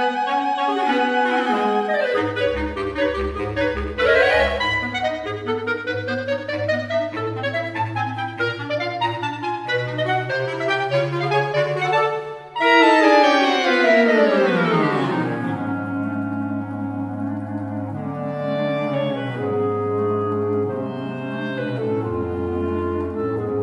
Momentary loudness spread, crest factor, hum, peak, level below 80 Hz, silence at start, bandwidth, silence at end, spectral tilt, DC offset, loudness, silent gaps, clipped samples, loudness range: 11 LU; 20 dB; none; -2 dBFS; -44 dBFS; 0 s; 11.5 kHz; 0 s; -6 dB/octave; under 0.1%; -21 LUFS; none; under 0.1%; 8 LU